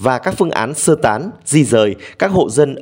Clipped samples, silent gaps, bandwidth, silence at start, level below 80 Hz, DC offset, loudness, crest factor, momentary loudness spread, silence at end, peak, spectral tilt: under 0.1%; none; 16.5 kHz; 0 s; -50 dBFS; under 0.1%; -15 LUFS; 14 dB; 5 LU; 0 s; 0 dBFS; -5 dB/octave